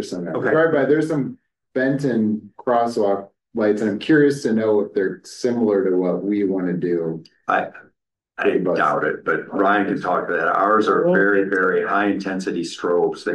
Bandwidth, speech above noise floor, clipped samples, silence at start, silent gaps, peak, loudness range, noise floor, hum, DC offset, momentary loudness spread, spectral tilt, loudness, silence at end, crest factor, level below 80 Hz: 12 kHz; 44 dB; under 0.1%; 0 s; none; -6 dBFS; 4 LU; -64 dBFS; none; under 0.1%; 9 LU; -6.5 dB/octave; -20 LUFS; 0 s; 14 dB; -66 dBFS